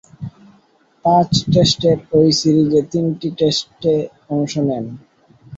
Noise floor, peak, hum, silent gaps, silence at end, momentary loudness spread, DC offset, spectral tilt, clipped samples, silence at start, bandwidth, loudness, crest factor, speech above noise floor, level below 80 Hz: -55 dBFS; -2 dBFS; none; none; 0 s; 12 LU; under 0.1%; -6 dB/octave; under 0.1%; 0.2 s; 8 kHz; -16 LUFS; 16 dB; 39 dB; -48 dBFS